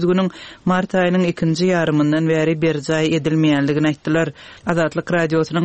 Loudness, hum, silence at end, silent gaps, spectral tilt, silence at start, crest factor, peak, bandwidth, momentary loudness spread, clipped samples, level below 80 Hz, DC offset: -18 LUFS; none; 0 s; none; -6.5 dB/octave; 0 s; 16 dB; -2 dBFS; 8.6 kHz; 4 LU; under 0.1%; -52 dBFS; 0.2%